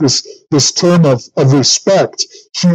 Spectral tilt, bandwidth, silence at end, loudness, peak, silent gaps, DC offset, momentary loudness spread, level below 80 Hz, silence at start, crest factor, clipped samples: -4.5 dB/octave; 9 kHz; 0 s; -11 LUFS; -2 dBFS; none; under 0.1%; 7 LU; -54 dBFS; 0 s; 10 dB; under 0.1%